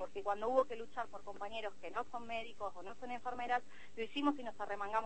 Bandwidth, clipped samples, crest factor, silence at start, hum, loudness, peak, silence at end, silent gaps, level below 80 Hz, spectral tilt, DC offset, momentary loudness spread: 8.4 kHz; under 0.1%; 22 dB; 0 s; none; -41 LUFS; -20 dBFS; 0 s; none; -70 dBFS; -4.5 dB/octave; 0.5%; 11 LU